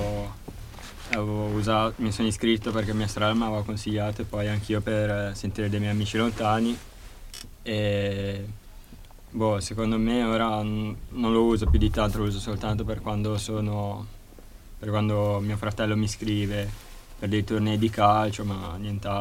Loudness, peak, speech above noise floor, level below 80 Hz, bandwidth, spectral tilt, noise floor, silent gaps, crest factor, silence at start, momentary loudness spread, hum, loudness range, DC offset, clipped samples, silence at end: -27 LUFS; -6 dBFS; 20 dB; -38 dBFS; 16 kHz; -6 dB/octave; -46 dBFS; none; 20 dB; 0 s; 15 LU; none; 4 LU; under 0.1%; under 0.1%; 0 s